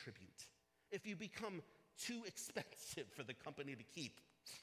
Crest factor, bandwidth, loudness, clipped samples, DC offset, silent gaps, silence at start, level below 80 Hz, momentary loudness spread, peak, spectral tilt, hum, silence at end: 22 dB; 16 kHz; -51 LUFS; under 0.1%; under 0.1%; none; 0 s; -82 dBFS; 11 LU; -32 dBFS; -3 dB/octave; none; 0 s